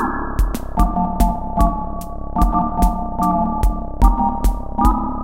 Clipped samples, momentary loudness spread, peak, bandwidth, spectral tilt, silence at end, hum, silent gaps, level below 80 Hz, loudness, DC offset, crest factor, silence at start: under 0.1%; 5 LU; 0 dBFS; 16.5 kHz; -7.5 dB/octave; 0 s; none; none; -20 dBFS; -20 LUFS; under 0.1%; 16 dB; 0 s